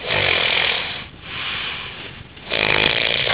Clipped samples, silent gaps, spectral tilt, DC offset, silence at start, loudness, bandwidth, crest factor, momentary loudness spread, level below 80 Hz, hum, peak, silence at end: under 0.1%; none; -6.5 dB/octave; 0.2%; 0 s; -18 LUFS; 4 kHz; 20 dB; 16 LU; -44 dBFS; none; -2 dBFS; 0 s